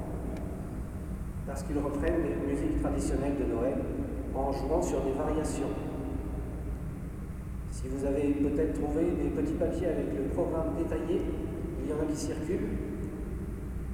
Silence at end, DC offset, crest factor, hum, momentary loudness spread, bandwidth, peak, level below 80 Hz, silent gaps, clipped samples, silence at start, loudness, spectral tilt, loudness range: 0 s; under 0.1%; 14 dB; none; 9 LU; 16.5 kHz; -16 dBFS; -38 dBFS; none; under 0.1%; 0 s; -33 LUFS; -7.5 dB/octave; 3 LU